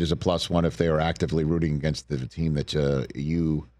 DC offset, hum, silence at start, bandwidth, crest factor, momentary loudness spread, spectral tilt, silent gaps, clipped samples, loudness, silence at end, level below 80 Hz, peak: under 0.1%; none; 0 s; 11.5 kHz; 20 dB; 5 LU; -6.5 dB/octave; none; under 0.1%; -26 LUFS; 0.15 s; -40 dBFS; -6 dBFS